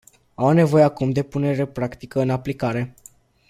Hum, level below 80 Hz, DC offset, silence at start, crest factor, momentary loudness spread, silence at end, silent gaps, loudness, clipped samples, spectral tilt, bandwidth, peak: none; -54 dBFS; under 0.1%; 0.4 s; 18 dB; 11 LU; 0.6 s; none; -21 LUFS; under 0.1%; -8 dB/octave; 14.5 kHz; -4 dBFS